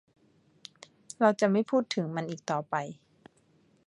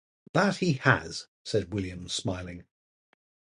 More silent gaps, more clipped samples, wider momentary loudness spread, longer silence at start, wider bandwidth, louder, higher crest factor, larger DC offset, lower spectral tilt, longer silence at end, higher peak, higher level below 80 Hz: second, none vs 1.28-1.45 s; neither; first, 24 LU vs 14 LU; first, 1.2 s vs 0.35 s; about the same, 11 kHz vs 11.5 kHz; about the same, -29 LUFS vs -29 LUFS; about the same, 22 dB vs 26 dB; neither; about the same, -5.5 dB/octave vs -5 dB/octave; about the same, 0.95 s vs 0.9 s; second, -10 dBFS vs -4 dBFS; second, -78 dBFS vs -54 dBFS